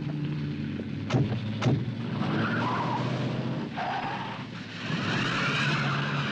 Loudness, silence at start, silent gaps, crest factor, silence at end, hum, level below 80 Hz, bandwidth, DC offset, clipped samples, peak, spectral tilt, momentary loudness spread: -29 LUFS; 0 s; none; 16 dB; 0 s; none; -58 dBFS; 8.8 kHz; under 0.1%; under 0.1%; -14 dBFS; -6 dB/octave; 8 LU